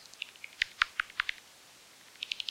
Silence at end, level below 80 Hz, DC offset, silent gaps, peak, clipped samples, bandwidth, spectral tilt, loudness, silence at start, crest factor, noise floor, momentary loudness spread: 0 s; -68 dBFS; under 0.1%; none; -10 dBFS; under 0.1%; 16.5 kHz; 1.5 dB/octave; -35 LUFS; 0 s; 28 dB; -57 dBFS; 23 LU